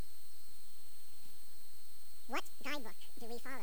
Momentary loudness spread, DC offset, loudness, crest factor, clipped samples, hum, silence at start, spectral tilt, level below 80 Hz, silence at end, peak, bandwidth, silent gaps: 13 LU; 3%; -49 LUFS; 24 dB; under 0.1%; none; 0 s; -3.5 dB/octave; -78 dBFS; 0 s; -26 dBFS; over 20 kHz; none